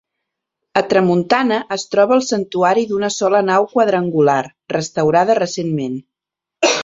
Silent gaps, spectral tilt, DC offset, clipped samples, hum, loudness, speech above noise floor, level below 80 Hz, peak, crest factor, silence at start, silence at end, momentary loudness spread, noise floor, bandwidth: none; -4.5 dB/octave; under 0.1%; under 0.1%; none; -16 LUFS; 69 dB; -60 dBFS; 0 dBFS; 16 dB; 0.75 s; 0 s; 7 LU; -85 dBFS; 7.8 kHz